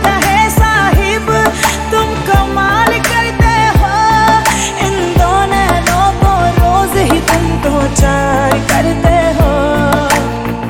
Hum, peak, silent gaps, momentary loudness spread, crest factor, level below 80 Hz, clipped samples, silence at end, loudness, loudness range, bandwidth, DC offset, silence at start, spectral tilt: none; 0 dBFS; none; 4 LU; 10 dB; -18 dBFS; under 0.1%; 0 s; -11 LUFS; 1 LU; 18.5 kHz; under 0.1%; 0 s; -4.5 dB/octave